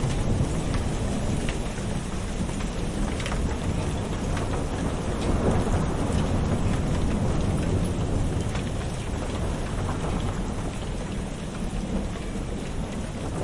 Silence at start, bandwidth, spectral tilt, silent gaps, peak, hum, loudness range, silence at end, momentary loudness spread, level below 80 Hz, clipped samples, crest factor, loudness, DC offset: 0 s; 11.5 kHz; -6 dB/octave; none; -12 dBFS; none; 5 LU; 0 s; 6 LU; -32 dBFS; under 0.1%; 16 dB; -28 LUFS; under 0.1%